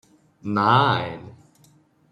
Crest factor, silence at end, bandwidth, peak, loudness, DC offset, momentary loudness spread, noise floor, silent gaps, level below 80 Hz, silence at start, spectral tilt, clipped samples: 20 dB; 0.8 s; 10 kHz; -4 dBFS; -20 LUFS; under 0.1%; 20 LU; -57 dBFS; none; -60 dBFS; 0.45 s; -7 dB/octave; under 0.1%